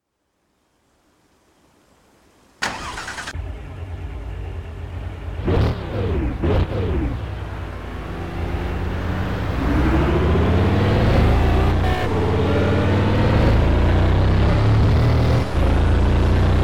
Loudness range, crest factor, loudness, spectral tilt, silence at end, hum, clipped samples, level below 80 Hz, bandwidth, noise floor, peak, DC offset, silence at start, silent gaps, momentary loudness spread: 14 LU; 12 dB; -20 LUFS; -7.5 dB/octave; 0 s; none; under 0.1%; -24 dBFS; 11 kHz; -70 dBFS; -6 dBFS; under 0.1%; 0 s; none; 15 LU